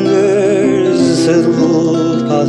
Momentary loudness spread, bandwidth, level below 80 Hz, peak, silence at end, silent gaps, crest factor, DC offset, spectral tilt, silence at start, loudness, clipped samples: 2 LU; 11 kHz; -50 dBFS; -2 dBFS; 0 s; none; 10 dB; under 0.1%; -6 dB/octave; 0 s; -11 LUFS; under 0.1%